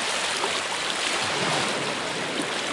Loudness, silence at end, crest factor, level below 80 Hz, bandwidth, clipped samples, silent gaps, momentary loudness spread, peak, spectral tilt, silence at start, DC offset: -25 LUFS; 0 s; 16 dB; -66 dBFS; 11.5 kHz; under 0.1%; none; 3 LU; -10 dBFS; -1.5 dB/octave; 0 s; under 0.1%